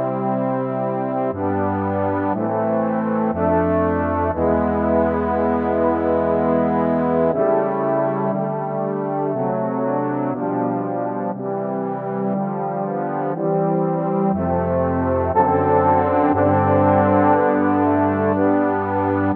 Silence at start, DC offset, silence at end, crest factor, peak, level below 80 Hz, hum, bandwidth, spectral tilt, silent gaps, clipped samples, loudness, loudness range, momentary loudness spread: 0 s; under 0.1%; 0 s; 16 dB; -2 dBFS; -44 dBFS; none; 4.2 kHz; -12 dB/octave; none; under 0.1%; -19 LUFS; 6 LU; 7 LU